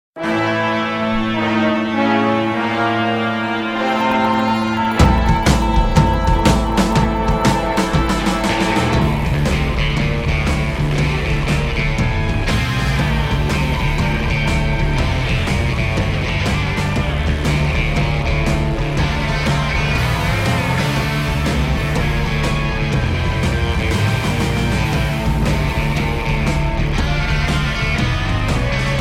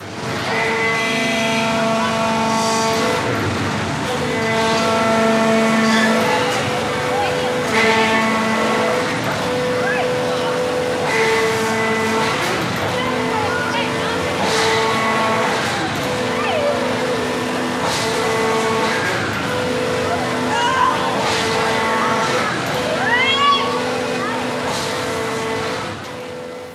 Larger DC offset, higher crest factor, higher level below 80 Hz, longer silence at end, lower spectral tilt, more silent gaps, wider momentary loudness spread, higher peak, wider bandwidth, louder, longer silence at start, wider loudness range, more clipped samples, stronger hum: neither; about the same, 16 dB vs 16 dB; first, -22 dBFS vs -50 dBFS; about the same, 0 s vs 0 s; first, -6 dB/octave vs -4 dB/octave; neither; about the same, 4 LU vs 6 LU; about the same, 0 dBFS vs -2 dBFS; about the same, 16 kHz vs 15.5 kHz; about the same, -17 LUFS vs -18 LUFS; first, 0.15 s vs 0 s; about the same, 3 LU vs 2 LU; neither; neither